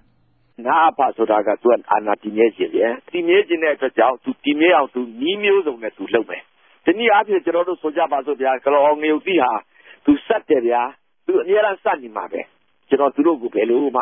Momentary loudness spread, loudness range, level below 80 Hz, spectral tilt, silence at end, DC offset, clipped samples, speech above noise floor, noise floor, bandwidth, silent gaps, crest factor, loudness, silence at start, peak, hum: 9 LU; 2 LU; -62 dBFS; -9.5 dB/octave; 0 s; under 0.1%; under 0.1%; 43 dB; -61 dBFS; 3.7 kHz; none; 16 dB; -18 LUFS; 0.6 s; -2 dBFS; none